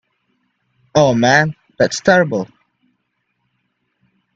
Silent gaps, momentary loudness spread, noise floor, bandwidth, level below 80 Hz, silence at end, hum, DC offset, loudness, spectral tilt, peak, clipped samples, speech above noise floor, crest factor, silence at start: none; 10 LU; -70 dBFS; 8.2 kHz; -54 dBFS; 1.9 s; none; under 0.1%; -15 LUFS; -5 dB/octave; 0 dBFS; under 0.1%; 56 dB; 18 dB; 0.95 s